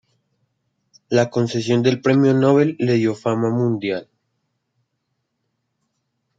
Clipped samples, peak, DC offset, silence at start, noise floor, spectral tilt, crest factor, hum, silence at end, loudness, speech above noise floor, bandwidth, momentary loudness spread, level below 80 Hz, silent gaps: under 0.1%; -2 dBFS; under 0.1%; 1.1 s; -74 dBFS; -7 dB/octave; 18 dB; none; 2.35 s; -18 LUFS; 57 dB; 7.8 kHz; 6 LU; -66 dBFS; none